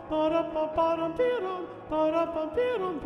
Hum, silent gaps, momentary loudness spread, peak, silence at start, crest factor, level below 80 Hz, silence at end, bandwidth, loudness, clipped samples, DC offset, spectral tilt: none; none; 5 LU; -14 dBFS; 0 s; 14 dB; -56 dBFS; 0 s; 9 kHz; -28 LUFS; under 0.1%; under 0.1%; -7 dB/octave